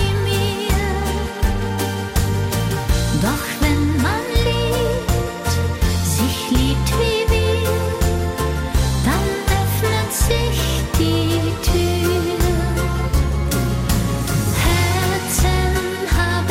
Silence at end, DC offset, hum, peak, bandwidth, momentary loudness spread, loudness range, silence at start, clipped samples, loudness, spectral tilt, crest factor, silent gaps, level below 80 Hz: 0 s; under 0.1%; none; -6 dBFS; 16.5 kHz; 3 LU; 1 LU; 0 s; under 0.1%; -19 LUFS; -5 dB/octave; 12 dB; none; -24 dBFS